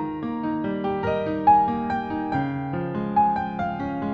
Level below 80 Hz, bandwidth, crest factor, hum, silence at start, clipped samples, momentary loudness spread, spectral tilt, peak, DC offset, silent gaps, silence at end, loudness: -50 dBFS; 6 kHz; 16 dB; none; 0 s; under 0.1%; 10 LU; -9 dB/octave; -6 dBFS; under 0.1%; none; 0 s; -24 LUFS